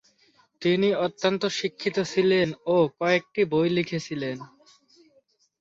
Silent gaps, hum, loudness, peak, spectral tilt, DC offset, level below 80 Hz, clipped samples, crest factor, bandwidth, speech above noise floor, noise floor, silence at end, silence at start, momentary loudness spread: none; none; -25 LUFS; -8 dBFS; -5.5 dB/octave; under 0.1%; -66 dBFS; under 0.1%; 18 dB; 7.8 kHz; 41 dB; -65 dBFS; 1.15 s; 0.6 s; 8 LU